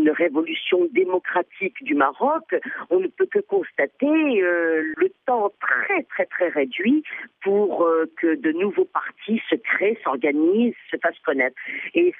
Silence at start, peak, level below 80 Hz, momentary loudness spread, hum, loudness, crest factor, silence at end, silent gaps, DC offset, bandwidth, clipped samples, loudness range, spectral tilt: 0 s; -6 dBFS; -80 dBFS; 6 LU; none; -22 LUFS; 16 dB; 0.05 s; none; under 0.1%; 3.8 kHz; under 0.1%; 1 LU; -8 dB/octave